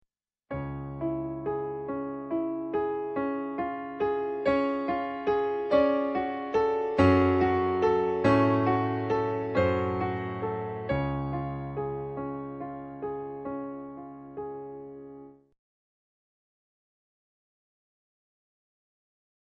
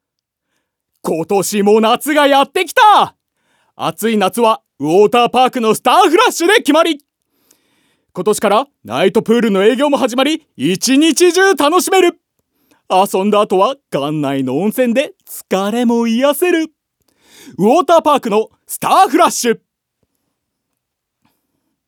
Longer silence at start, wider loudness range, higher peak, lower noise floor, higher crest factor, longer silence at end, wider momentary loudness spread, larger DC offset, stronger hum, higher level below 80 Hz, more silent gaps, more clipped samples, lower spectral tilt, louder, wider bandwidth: second, 0.5 s vs 1.05 s; first, 15 LU vs 4 LU; second, -8 dBFS vs 0 dBFS; second, -50 dBFS vs -76 dBFS; first, 22 dB vs 14 dB; first, 4.25 s vs 2.3 s; first, 15 LU vs 10 LU; neither; neither; first, -54 dBFS vs -66 dBFS; neither; neither; first, -8.5 dB/octave vs -4 dB/octave; second, -29 LUFS vs -13 LUFS; second, 8.2 kHz vs over 20 kHz